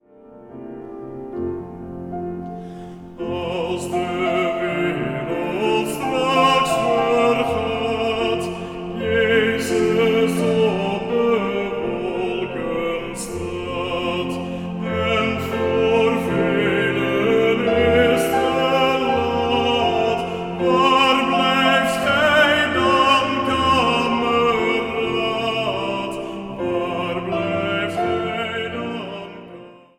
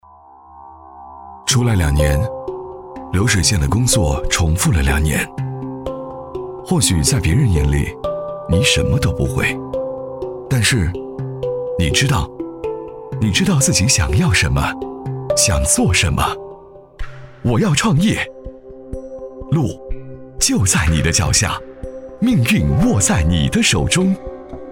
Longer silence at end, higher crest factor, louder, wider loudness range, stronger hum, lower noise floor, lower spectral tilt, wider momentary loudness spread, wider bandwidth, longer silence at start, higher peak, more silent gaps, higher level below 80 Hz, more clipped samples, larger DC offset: first, 0.2 s vs 0 s; about the same, 18 dB vs 16 dB; second, -19 LUFS vs -16 LUFS; first, 8 LU vs 4 LU; neither; about the same, -44 dBFS vs -44 dBFS; about the same, -5 dB/octave vs -4 dB/octave; second, 13 LU vs 18 LU; about the same, 17 kHz vs 16.5 kHz; second, 0.25 s vs 0.5 s; about the same, -2 dBFS vs -2 dBFS; neither; second, -46 dBFS vs -28 dBFS; neither; neither